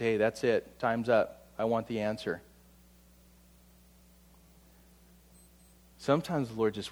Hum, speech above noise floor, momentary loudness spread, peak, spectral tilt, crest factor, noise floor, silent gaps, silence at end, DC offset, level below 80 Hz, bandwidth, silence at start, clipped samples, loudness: 60 Hz at -60 dBFS; 29 dB; 9 LU; -14 dBFS; -6 dB/octave; 20 dB; -60 dBFS; none; 0 s; under 0.1%; -62 dBFS; over 20 kHz; 0 s; under 0.1%; -31 LUFS